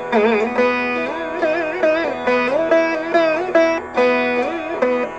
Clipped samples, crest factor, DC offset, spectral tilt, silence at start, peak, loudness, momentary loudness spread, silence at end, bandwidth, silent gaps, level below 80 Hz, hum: under 0.1%; 14 dB; 0.1%; -5 dB/octave; 0 s; -4 dBFS; -18 LUFS; 5 LU; 0 s; 8.6 kHz; none; -54 dBFS; none